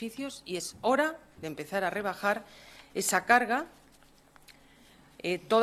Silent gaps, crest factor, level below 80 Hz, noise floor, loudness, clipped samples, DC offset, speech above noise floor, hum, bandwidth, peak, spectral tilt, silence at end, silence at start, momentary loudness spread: none; 24 dB; -68 dBFS; -60 dBFS; -30 LUFS; under 0.1%; under 0.1%; 30 dB; none; 14.5 kHz; -8 dBFS; -3 dB/octave; 0 s; 0 s; 17 LU